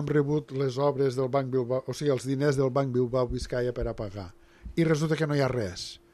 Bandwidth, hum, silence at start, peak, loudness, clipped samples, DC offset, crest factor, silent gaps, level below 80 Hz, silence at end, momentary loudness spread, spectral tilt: 12.5 kHz; none; 0 s; -12 dBFS; -28 LUFS; under 0.1%; under 0.1%; 16 dB; none; -48 dBFS; 0.15 s; 9 LU; -6.5 dB/octave